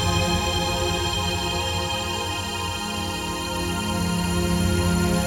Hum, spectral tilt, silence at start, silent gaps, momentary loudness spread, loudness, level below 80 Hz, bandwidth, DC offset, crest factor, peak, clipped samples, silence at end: none; -4 dB/octave; 0 s; none; 5 LU; -24 LUFS; -34 dBFS; 17 kHz; under 0.1%; 14 dB; -8 dBFS; under 0.1%; 0 s